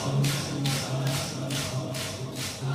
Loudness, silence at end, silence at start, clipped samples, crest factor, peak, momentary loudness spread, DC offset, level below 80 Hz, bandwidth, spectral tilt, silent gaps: -29 LUFS; 0 s; 0 s; under 0.1%; 16 dB; -14 dBFS; 6 LU; under 0.1%; -56 dBFS; 16 kHz; -4.5 dB/octave; none